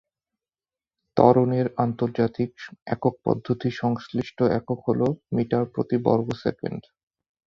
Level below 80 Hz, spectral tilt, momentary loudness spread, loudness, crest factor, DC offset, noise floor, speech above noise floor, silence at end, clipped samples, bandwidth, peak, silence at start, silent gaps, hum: -58 dBFS; -9 dB/octave; 11 LU; -24 LUFS; 22 dB; under 0.1%; under -90 dBFS; over 67 dB; 0.65 s; under 0.1%; 7 kHz; -2 dBFS; 1.15 s; 2.82-2.86 s; none